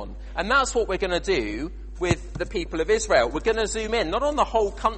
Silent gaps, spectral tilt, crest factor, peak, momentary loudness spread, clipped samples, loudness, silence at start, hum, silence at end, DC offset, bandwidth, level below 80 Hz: none; -4 dB/octave; 18 dB; -6 dBFS; 10 LU; under 0.1%; -24 LUFS; 0 s; none; 0 s; under 0.1%; 8.8 kHz; -36 dBFS